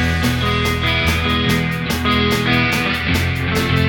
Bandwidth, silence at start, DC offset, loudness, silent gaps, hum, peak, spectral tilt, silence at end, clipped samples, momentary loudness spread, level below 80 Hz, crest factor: 19 kHz; 0 s; under 0.1%; -17 LUFS; none; none; -4 dBFS; -5 dB/octave; 0 s; under 0.1%; 3 LU; -28 dBFS; 14 dB